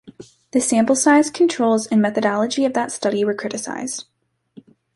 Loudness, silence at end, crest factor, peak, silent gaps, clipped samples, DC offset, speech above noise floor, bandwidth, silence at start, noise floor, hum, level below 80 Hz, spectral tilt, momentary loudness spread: -19 LUFS; 0.95 s; 16 dB; -4 dBFS; none; under 0.1%; under 0.1%; 30 dB; 11.5 kHz; 0.05 s; -48 dBFS; none; -66 dBFS; -4 dB/octave; 11 LU